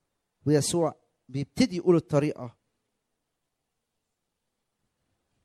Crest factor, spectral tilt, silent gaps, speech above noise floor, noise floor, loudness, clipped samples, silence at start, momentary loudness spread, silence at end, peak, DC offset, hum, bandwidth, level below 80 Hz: 20 dB; -6 dB/octave; none; 57 dB; -82 dBFS; -26 LUFS; under 0.1%; 0.45 s; 14 LU; 2.95 s; -10 dBFS; under 0.1%; none; 14.5 kHz; -62 dBFS